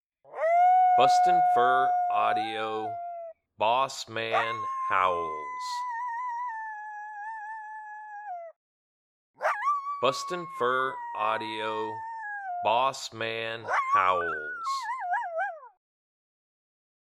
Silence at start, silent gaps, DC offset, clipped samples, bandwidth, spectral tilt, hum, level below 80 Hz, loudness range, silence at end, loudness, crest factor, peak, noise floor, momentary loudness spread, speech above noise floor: 0.3 s; 8.56-9.34 s; under 0.1%; under 0.1%; 12.5 kHz; -3 dB/octave; none; -76 dBFS; 11 LU; 1.3 s; -27 LUFS; 22 dB; -8 dBFS; under -90 dBFS; 17 LU; over 63 dB